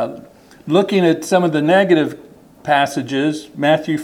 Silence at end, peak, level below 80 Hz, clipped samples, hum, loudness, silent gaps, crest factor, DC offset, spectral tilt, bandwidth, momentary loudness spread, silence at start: 0 s; -2 dBFS; -60 dBFS; under 0.1%; none; -16 LUFS; none; 16 dB; under 0.1%; -5.5 dB/octave; 16 kHz; 10 LU; 0 s